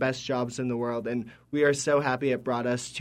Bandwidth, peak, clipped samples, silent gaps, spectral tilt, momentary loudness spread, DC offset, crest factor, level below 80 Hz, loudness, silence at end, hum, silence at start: 13.5 kHz; -12 dBFS; under 0.1%; none; -5 dB/octave; 8 LU; under 0.1%; 16 dB; -64 dBFS; -28 LUFS; 0 s; none; 0 s